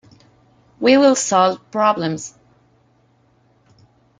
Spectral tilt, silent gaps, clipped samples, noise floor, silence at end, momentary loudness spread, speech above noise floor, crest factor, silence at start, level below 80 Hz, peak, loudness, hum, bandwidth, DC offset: -4 dB/octave; none; under 0.1%; -58 dBFS; 1.9 s; 13 LU; 42 dB; 18 dB; 0.8 s; -64 dBFS; -2 dBFS; -16 LUFS; none; 9.6 kHz; under 0.1%